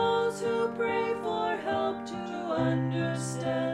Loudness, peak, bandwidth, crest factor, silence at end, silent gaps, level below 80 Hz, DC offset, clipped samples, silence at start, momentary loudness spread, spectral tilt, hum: -30 LUFS; -16 dBFS; 13 kHz; 14 dB; 0 s; none; -62 dBFS; under 0.1%; under 0.1%; 0 s; 4 LU; -6 dB/octave; none